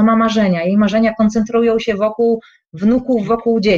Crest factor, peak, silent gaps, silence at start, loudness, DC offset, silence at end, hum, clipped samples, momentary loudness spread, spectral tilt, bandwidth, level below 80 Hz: 10 dB; -4 dBFS; none; 0 s; -15 LUFS; under 0.1%; 0 s; none; under 0.1%; 4 LU; -7 dB/octave; 7.4 kHz; -44 dBFS